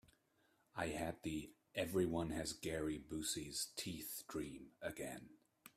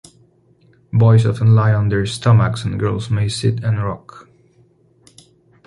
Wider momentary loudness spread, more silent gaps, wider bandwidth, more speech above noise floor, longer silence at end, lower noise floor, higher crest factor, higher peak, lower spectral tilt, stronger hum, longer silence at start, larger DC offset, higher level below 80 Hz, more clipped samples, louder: about the same, 10 LU vs 9 LU; neither; first, 16 kHz vs 11 kHz; second, 34 dB vs 39 dB; second, 0.1 s vs 1.45 s; first, -78 dBFS vs -54 dBFS; about the same, 20 dB vs 16 dB; second, -26 dBFS vs -2 dBFS; second, -4 dB/octave vs -7 dB/octave; neither; second, 0.75 s vs 0.95 s; neither; second, -66 dBFS vs -42 dBFS; neither; second, -44 LUFS vs -16 LUFS